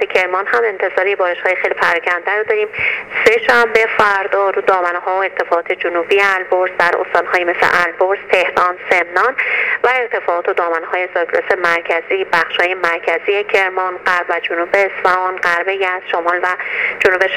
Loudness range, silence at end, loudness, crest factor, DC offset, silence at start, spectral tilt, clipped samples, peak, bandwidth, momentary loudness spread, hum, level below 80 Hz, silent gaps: 2 LU; 0 s; -14 LUFS; 16 dB; under 0.1%; 0 s; -3 dB/octave; under 0.1%; 0 dBFS; 16.5 kHz; 5 LU; none; -54 dBFS; none